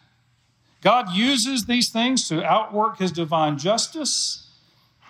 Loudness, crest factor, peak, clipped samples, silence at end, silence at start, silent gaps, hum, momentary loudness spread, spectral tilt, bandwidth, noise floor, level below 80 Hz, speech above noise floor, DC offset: -21 LUFS; 16 dB; -6 dBFS; under 0.1%; 0.7 s; 0.85 s; none; none; 4 LU; -3 dB/octave; 16 kHz; -63 dBFS; -66 dBFS; 42 dB; under 0.1%